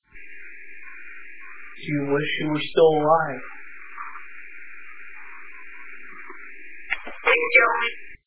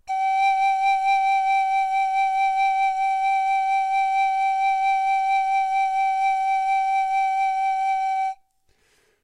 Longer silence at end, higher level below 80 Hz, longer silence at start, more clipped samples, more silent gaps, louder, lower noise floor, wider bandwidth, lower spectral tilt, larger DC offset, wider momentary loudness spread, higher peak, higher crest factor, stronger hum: second, 0 s vs 0.9 s; about the same, -62 dBFS vs -66 dBFS; about the same, 0 s vs 0.05 s; neither; neither; about the same, -21 LUFS vs -21 LUFS; second, -43 dBFS vs -64 dBFS; second, 4 kHz vs 11 kHz; first, -8.5 dB/octave vs 2.5 dB/octave; first, 2% vs under 0.1%; first, 24 LU vs 3 LU; first, -4 dBFS vs -12 dBFS; first, 22 dB vs 8 dB; neither